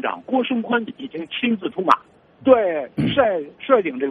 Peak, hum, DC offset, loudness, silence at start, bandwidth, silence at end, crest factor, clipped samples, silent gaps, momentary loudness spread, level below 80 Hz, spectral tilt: 0 dBFS; none; under 0.1%; -20 LUFS; 0 s; 6.2 kHz; 0 s; 20 dB; under 0.1%; none; 9 LU; -58 dBFS; -7 dB/octave